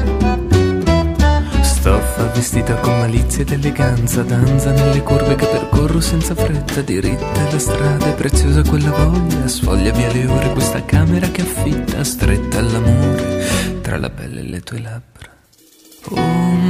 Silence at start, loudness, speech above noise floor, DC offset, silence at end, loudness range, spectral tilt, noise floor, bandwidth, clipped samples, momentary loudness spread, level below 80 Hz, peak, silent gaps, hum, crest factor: 0 s; -16 LUFS; 34 dB; under 0.1%; 0 s; 3 LU; -6 dB/octave; -49 dBFS; 15.5 kHz; under 0.1%; 6 LU; -22 dBFS; 0 dBFS; none; none; 14 dB